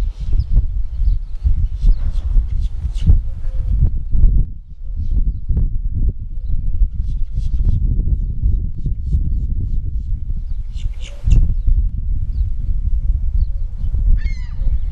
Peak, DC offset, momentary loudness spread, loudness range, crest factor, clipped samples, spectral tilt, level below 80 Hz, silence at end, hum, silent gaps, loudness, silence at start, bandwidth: 0 dBFS; under 0.1%; 8 LU; 2 LU; 14 dB; under 0.1%; -8.5 dB/octave; -16 dBFS; 0 s; none; none; -22 LUFS; 0 s; 3.7 kHz